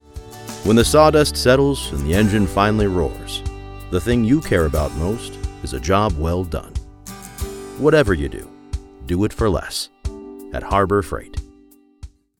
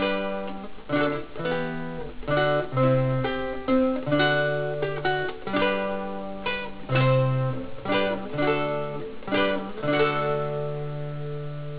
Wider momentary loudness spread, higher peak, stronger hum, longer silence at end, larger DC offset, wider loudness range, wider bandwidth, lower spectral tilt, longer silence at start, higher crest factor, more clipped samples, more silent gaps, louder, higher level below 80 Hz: first, 18 LU vs 11 LU; first, 0 dBFS vs -8 dBFS; neither; first, 0.35 s vs 0 s; second, under 0.1% vs 1%; first, 6 LU vs 2 LU; first, 18.5 kHz vs 4 kHz; second, -5.5 dB/octave vs -10 dB/octave; first, 0.15 s vs 0 s; about the same, 18 dB vs 16 dB; neither; neither; first, -18 LUFS vs -26 LUFS; first, -30 dBFS vs -50 dBFS